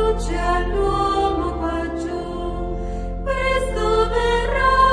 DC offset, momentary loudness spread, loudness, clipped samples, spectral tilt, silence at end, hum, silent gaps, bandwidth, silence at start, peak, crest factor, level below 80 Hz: under 0.1%; 9 LU; -21 LUFS; under 0.1%; -5.5 dB/octave; 0 s; none; none; 10.5 kHz; 0 s; -4 dBFS; 16 dB; -26 dBFS